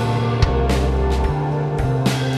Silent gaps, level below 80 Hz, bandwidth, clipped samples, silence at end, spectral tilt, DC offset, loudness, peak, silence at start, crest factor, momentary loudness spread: none; -24 dBFS; 13.5 kHz; under 0.1%; 0 s; -6.5 dB/octave; under 0.1%; -19 LUFS; -2 dBFS; 0 s; 16 dB; 3 LU